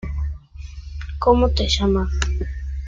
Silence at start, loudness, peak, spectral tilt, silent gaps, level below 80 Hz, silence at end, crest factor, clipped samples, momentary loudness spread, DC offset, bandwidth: 0 s; -21 LUFS; -4 dBFS; -5.5 dB/octave; none; -26 dBFS; 0 s; 18 dB; under 0.1%; 19 LU; under 0.1%; 7.8 kHz